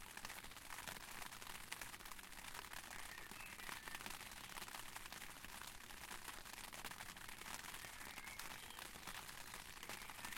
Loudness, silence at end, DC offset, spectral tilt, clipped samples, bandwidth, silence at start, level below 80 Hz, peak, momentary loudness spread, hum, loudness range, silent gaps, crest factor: -52 LUFS; 0 s; under 0.1%; -1 dB/octave; under 0.1%; 17 kHz; 0 s; -66 dBFS; -28 dBFS; 3 LU; none; 0 LU; none; 26 dB